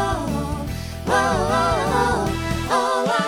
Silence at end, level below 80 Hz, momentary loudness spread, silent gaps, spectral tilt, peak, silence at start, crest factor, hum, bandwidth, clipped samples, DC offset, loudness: 0 s; -34 dBFS; 8 LU; none; -5 dB/octave; -6 dBFS; 0 s; 16 dB; none; 18.5 kHz; under 0.1%; under 0.1%; -21 LUFS